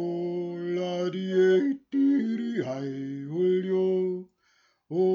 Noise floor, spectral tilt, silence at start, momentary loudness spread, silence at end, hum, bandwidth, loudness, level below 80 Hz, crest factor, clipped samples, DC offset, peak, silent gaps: -67 dBFS; -8 dB/octave; 0 s; 11 LU; 0 s; none; 7 kHz; -27 LUFS; -80 dBFS; 14 dB; under 0.1%; under 0.1%; -14 dBFS; none